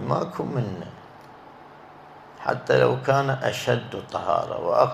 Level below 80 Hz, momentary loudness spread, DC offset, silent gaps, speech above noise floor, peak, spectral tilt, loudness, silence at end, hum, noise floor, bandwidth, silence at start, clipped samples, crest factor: -60 dBFS; 25 LU; under 0.1%; none; 22 dB; -4 dBFS; -6 dB/octave; -24 LUFS; 0 s; none; -46 dBFS; 14.5 kHz; 0 s; under 0.1%; 22 dB